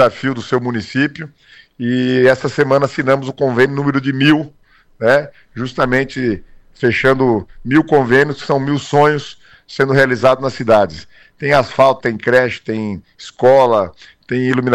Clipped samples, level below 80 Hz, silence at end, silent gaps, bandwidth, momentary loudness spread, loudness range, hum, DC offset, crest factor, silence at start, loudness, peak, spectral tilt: under 0.1%; -46 dBFS; 0 s; none; 12.5 kHz; 12 LU; 2 LU; none; under 0.1%; 14 dB; 0 s; -15 LUFS; -2 dBFS; -6.5 dB/octave